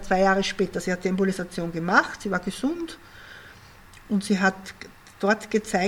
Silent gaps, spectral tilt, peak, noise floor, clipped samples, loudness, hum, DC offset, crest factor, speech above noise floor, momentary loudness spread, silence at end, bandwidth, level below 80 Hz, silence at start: none; -5 dB/octave; -4 dBFS; -48 dBFS; under 0.1%; -25 LUFS; none; under 0.1%; 22 dB; 24 dB; 22 LU; 0 s; 16 kHz; -50 dBFS; 0 s